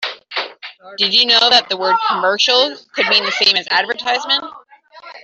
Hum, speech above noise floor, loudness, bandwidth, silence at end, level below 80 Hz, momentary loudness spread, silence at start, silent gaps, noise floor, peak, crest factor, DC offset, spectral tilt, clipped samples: none; 25 dB; -14 LUFS; 8.2 kHz; 0.05 s; -66 dBFS; 14 LU; 0 s; none; -40 dBFS; 0 dBFS; 16 dB; under 0.1%; -1 dB/octave; under 0.1%